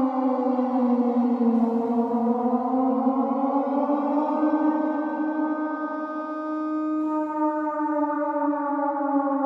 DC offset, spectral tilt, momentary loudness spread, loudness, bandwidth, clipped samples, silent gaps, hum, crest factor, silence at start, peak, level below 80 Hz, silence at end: under 0.1%; -9 dB/octave; 6 LU; -24 LUFS; 5.2 kHz; under 0.1%; none; none; 14 dB; 0 s; -10 dBFS; -76 dBFS; 0 s